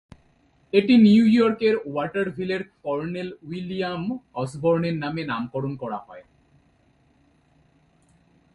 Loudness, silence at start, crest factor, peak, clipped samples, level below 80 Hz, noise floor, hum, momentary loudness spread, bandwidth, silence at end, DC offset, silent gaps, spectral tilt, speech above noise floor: -23 LUFS; 0.75 s; 20 dB; -4 dBFS; under 0.1%; -60 dBFS; -61 dBFS; none; 16 LU; 10.5 kHz; 2.35 s; under 0.1%; none; -7.5 dB/octave; 39 dB